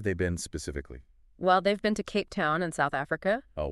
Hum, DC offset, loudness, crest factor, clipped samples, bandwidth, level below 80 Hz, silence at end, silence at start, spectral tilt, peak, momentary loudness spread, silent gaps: none; under 0.1%; -29 LUFS; 18 dB; under 0.1%; 13 kHz; -48 dBFS; 0 s; 0 s; -5 dB/octave; -10 dBFS; 12 LU; none